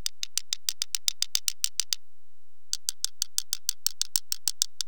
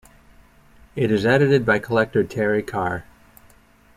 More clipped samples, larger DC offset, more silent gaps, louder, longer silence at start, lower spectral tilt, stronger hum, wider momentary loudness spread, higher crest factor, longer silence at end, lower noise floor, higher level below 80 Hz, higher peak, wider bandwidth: neither; first, 3% vs under 0.1%; neither; second, -29 LUFS vs -20 LUFS; second, 0.25 s vs 0.95 s; second, 3.5 dB/octave vs -7 dB/octave; neither; second, 5 LU vs 10 LU; first, 32 dB vs 18 dB; second, 0.35 s vs 0.95 s; first, -74 dBFS vs -53 dBFS; second, -84 dBFS vs -52 dBFS; first, 0 dBFS vs -4 dBFS; first, over 20 kHz vs 15.5 kHz